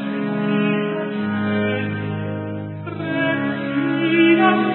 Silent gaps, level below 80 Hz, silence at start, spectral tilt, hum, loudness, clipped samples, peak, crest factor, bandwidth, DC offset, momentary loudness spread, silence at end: none; -56 dBFS; 0 s; -11.5 dB/octave; none; -20 LUFS; under 0.1%; -4 dBFS; 16 dB; 4.2 kHz; under 0.1%; 13 LU; 0 s